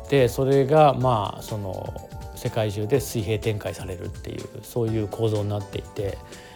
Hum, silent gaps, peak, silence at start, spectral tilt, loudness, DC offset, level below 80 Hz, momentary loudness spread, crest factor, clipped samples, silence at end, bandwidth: none; none; -4 dBFS; 0 s; -6.5 dB/octave; -24 LUFS; under 0.1%; -44 dBFS; 17 LU; 20 dB; under 0.1%; 0 s; 19.5 kHz